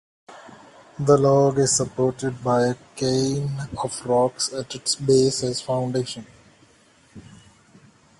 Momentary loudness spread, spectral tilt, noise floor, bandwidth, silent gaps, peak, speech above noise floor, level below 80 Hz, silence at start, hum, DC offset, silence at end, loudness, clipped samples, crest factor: 11 LU; -5 dB/octave; -56 dBFS; 11.5 kHz; none; -4 dBFS; 35 dB; -56 dBFS; 0.3 s; none; under 0.1%; 1 s; -22 LUFS; under 0.1%; 18 dB